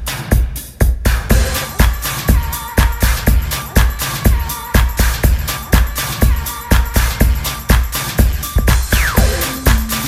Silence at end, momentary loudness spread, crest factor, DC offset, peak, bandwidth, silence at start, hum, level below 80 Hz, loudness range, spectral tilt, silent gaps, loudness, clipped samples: 0 s; 4 LU; 14 dB; under 0.1%; 0 dBFS; 16 kHz; 0 s; none; -16 dBFS; 1 LU; -4.5 dB/octave; none; -16 LUFS; 0.2%